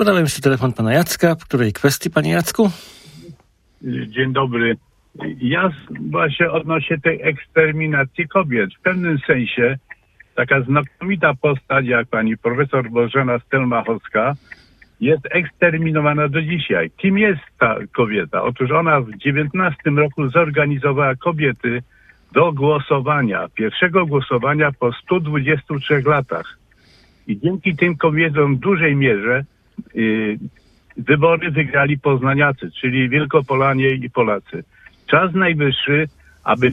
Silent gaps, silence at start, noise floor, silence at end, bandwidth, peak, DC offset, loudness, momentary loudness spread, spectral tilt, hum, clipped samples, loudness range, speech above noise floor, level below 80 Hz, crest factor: none; 0 s; -52 dBFS; 0 s; 15.5 kHz; 0 dBFS; under 0.1%; -17 LUFS; 8 LU; -6 dB/octave; none; under 0.1%; 2 LU; 34 dB; -52 dBFS; 18 dB